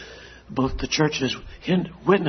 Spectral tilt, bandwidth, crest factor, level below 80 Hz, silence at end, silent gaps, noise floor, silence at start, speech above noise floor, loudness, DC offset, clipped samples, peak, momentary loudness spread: -5 dB/octave; 6.4 kHz; 20 dB; -40 dBFS; 0 s; none; -43 dBFS; 0 s; 20 dB; -24 LUFS; under 0.1%; under 0.1%; -4 dBFS; 12 LU